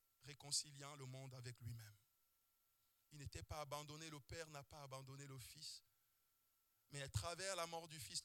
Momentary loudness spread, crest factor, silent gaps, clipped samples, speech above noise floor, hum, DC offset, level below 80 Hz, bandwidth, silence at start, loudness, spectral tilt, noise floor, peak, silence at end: 14 LU; 24 dB; none; under 0.1%; 31 dB; none; under 0.1%; -72 dBFS; 18 kHz; 0.2 s; -51 LUFS; -3 dB/octave; -83 dBFS; -30 dBFS; 0 s